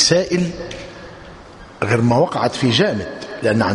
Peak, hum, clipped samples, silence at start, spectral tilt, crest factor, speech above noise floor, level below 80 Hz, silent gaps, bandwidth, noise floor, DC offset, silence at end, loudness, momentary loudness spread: 0 dBFS; none; under 0.1%; 0 s; -4.5 dB/octave; 18 dB; 22 dB; -46 dBFS; none; 11 kHz; -39 dBFS; under 0.1%; 0 s; -18 LUFS; 21 LU